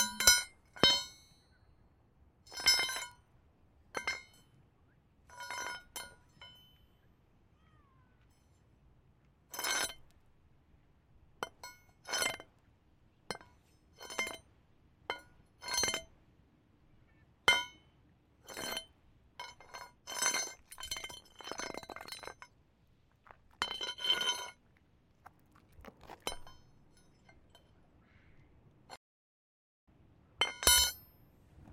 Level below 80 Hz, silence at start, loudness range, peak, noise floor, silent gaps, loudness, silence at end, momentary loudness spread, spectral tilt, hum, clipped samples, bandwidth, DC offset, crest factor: -60 dBFS; 0 s; 15 LU; -8 dBFS; -69 dBFS; 28.97-29.87 s; -33 LUFS; 0 s; 25 LU; 0 dB/octave; none; under 0.1%; 16.5 kHz; under 0.1%; 32 dB